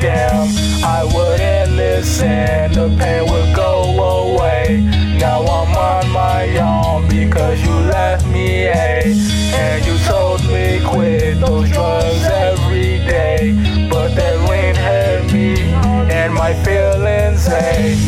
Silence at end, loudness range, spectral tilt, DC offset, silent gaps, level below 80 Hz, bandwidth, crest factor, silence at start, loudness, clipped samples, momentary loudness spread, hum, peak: 0 s; 0 LU; -6 dB/octave; under 0.1%; none; -20 dBFS; 15 kHz; 8 dB; 0 s; -14 LUFS; under 0.1%; 1 LU; none; -4 dBFS